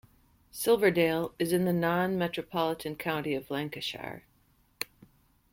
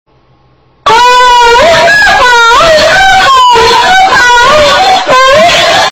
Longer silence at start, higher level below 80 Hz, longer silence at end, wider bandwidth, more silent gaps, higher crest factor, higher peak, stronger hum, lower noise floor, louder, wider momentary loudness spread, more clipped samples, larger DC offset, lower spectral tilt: second, 0.55 s vs 0.85 s; second, -64 dBFS vs -28 dBFS; first, 0.7 s vs 0 s; about the same, 16.5 kHz vs 17.5 kHz; neither; first, 20 dB vs 4 dB; second, -12 dBFS vs 0 dBFS; neither; first, -67 dBFS vs -45 dBFS; second, -30 LUFS vs -3 LUFS; first, 14 LU vs 2 LU; second, under 0.1% vs 0.4%; neither; first, -5 dB/octave vs -1.5 dB/octave